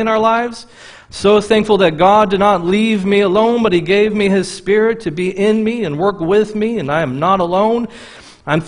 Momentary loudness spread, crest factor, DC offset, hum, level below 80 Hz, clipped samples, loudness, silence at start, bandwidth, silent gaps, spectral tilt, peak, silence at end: 8 LU; 14 dB; under 0.1%; none; -46 dBFS; under 0.1%; -14 LUFS; 0 s; 10.5 kHz; none; -6 dB/octave; 0 dBFS; 0 s